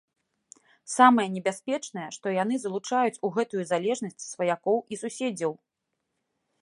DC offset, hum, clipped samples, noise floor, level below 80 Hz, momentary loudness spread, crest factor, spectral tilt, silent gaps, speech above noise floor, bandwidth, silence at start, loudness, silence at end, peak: under 0.1%; none; under 0.1%; -82 dBFS; -80 dBFS; 14 LU; 24 dB; -4.5 dB/octave; none; 55 dB; 11.5 kHz; 0.85 s; -27 LUFS; 1.1 s; -4 dBFS